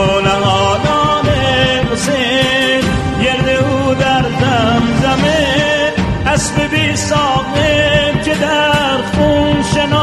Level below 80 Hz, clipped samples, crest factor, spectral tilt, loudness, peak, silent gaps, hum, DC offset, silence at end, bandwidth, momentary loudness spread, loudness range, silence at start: -28 dBFS; under 0.1%; 12 dB; -4.5 dB/octave; -12 LUFS; 0 dBFS; none; none; under 0.1%; 0 s; 13.5 kHz; 3 LU; 0 LU; 0 s